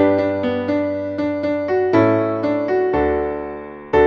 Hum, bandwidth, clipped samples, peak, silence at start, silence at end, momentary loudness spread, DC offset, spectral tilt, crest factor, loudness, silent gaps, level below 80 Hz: none; 6.8 kHz; under 0.1%; -2 dBFS; 0 s; 0 s; 8 LU; under 0.1%; -8.5 dB/octave; 16 dB; -19 LUFS; none; -42 dBFS